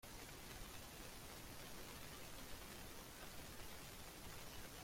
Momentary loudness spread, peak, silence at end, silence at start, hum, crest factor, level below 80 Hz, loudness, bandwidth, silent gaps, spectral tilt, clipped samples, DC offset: 1 LU; -36 dBFS; 0 s; 0 s; none; 18 dB; -62 dBFS; -54 LUFS; 16.5 kHz; none; -3 dB/octave; under 0.1%; under 0.1%